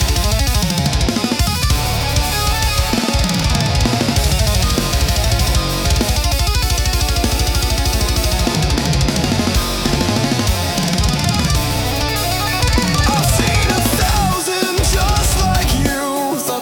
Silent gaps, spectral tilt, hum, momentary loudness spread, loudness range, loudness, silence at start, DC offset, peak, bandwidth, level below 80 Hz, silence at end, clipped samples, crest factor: none; -4 dB/octave; none; 2 LU; 1 LU; -16 LUFS; 0 s; under 0.1%; -2 dBFS; 18.5 kHz; -20 dBFS; 0 s; under 0.1%; 12 dB